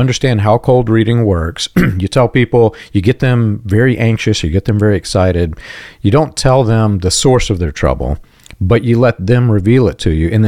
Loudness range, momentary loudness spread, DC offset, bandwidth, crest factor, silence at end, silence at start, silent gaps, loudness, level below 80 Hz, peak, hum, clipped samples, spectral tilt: 1 LU; 6 LU; 0.5%; 14 kHz; 10 dB; 0 s; 0 s; none; -12 LUFS; -28 dBFS; 0 dBFS; none; under 0.1%; -6 dB/octave